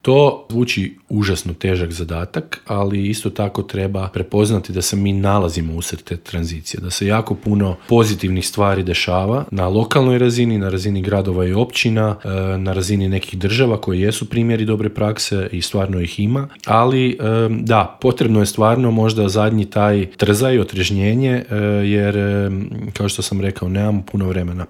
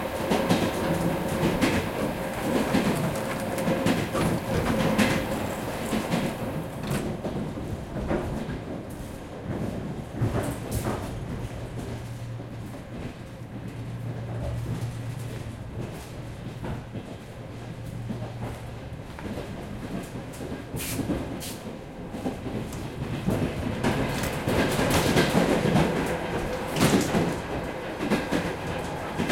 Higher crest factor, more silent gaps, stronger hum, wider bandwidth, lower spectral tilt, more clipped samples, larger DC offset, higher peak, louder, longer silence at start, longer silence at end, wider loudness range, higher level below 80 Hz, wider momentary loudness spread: about the same, 16 dB vs 20 dB; neither; neither; about the same, 15.5 kHz vs 16.5 kHz; about the same, -6 dB/octave vs -5.5 dB/octave; neither; neither; first, 0 dBFS vs -8 dBFS; first, -18 LUFS vs -29 LUFS; about the same, 0.05 s vs 0 s; about the same, 0.05 s vs 0 s; second, 4 LU vs 12 LU; about the same, -44 dBFS vs -44 dBFS; second, 7 LU vs 14 LU